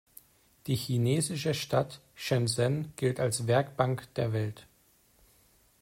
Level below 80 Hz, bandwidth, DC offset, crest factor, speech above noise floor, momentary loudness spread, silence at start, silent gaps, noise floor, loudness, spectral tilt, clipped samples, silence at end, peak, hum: -64 dBFS; 16 kHz; under 0.1%; 18 dB; 36 dB; 10 LU; 0.65 s; none; -65 dBFS; -30 LUFS; -5.5 dB/octave; under 0.1%; 1.2 s; -12 dBFS; none